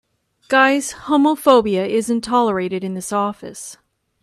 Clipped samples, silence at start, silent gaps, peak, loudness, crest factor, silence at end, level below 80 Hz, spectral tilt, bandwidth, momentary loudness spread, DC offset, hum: under 0.1%; 0.5 s; none; 0 dBFS; -17 LUFS; 18 dB; 0.5 s; -56 dBFS; -4.5 dB/octave; 14 kHz; 15 LU; under 0.1%; none